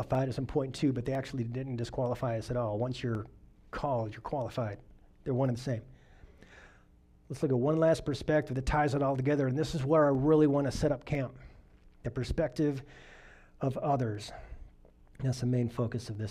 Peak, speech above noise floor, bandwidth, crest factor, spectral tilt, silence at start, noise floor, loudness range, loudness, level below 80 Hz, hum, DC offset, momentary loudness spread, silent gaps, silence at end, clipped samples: -14 dBFS; 30 dB; 12.5 kHz; 18 dB; -7.5 dB/octave; 0 s; -61 dBFS; 8 LU; -32 LUFS; -50 dBFS; none; under 0.1%; 13 LU; none; 0 s; under 0.1%